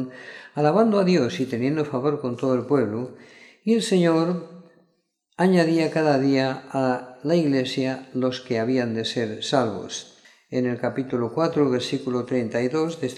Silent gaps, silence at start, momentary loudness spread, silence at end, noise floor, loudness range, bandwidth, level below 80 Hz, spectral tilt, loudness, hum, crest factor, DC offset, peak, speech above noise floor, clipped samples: none; 0 s; 9 LU; 0 s; -70 dBFS; 3 LU; 12.5 kHz; -70 dBFS; -6 dB/octave; -23 LUFS; none; 18 dB; under 0.1%; -4 dBFS; 48 dB; under 0.1%